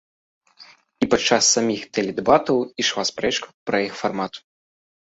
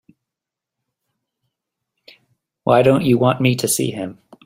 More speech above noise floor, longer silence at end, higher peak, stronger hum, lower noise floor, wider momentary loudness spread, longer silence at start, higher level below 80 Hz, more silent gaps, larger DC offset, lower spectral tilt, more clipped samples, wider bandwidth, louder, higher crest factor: second, 29 dB vs 69 dB; first, 0.75 s vs 0.35 s; about the same, -2 dBFS vs -2 dBFS; neither; second, -50 dBFS vs -85 dBFS; second, 10 LU vs 13 LU; second, 0.6 s vs 2.65 s; about the same, -56 dBFS vs -56 dBFS; first, 3.54-3.66 s vs none; neither; second, -2.5 dB/octave vs -5 dB/octave; neither; second, 8.2 kHz vs 16 kHz; second, -21 LUFS vs -16 LUFS; about the same, 22 dB vs 18 dB